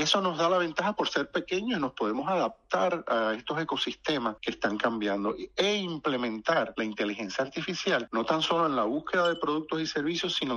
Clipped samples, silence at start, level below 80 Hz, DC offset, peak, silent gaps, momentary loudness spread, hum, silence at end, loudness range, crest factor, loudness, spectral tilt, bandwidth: under 0.1%; 0 s; -64 dBFS; under 0.1%; -12 dBFS; none; 5 LU; none; 0 s; 1 LU; 18 dB; -29 LUFS; -4 dB/octave; 11 kHz